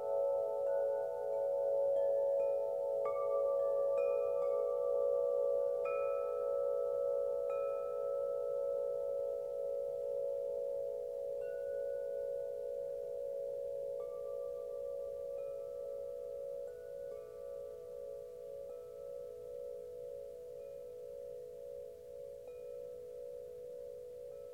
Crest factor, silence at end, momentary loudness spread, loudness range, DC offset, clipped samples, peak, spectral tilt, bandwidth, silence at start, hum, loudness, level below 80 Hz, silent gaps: 14 dB; 0 s; 14 LU; 13 LU; under 0.1%; under 0.1%; -26 dBFS; -5.5 dB/octave; 15.5 kHz; 0 s; none; -39 LUFS; -74 dBFS; none